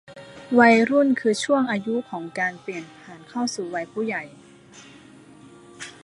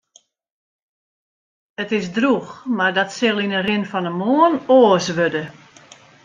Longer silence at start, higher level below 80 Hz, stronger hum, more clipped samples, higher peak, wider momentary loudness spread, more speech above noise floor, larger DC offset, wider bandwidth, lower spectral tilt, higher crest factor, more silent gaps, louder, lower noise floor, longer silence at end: second, 0.1 s vs 1.8 s; second, -70 dBFS vs -64 dBFS; neither; neither; about the same, -2 dBFS vs -2 dBFS; first, 25 LU vs 12 LU; second, 26 dB vs 38 dB; neither; first, 11.5 kHz vs 9.4 kHz; about the same, -4.5 dB/octave vs -5 dB/octave; about the same, 22 dB vs 18 dB; neither; second, -22 LUFS vs -18 LUFS; second, -48 dBFS vs -56 dBFS; second, 0.15 s vs 0.75 s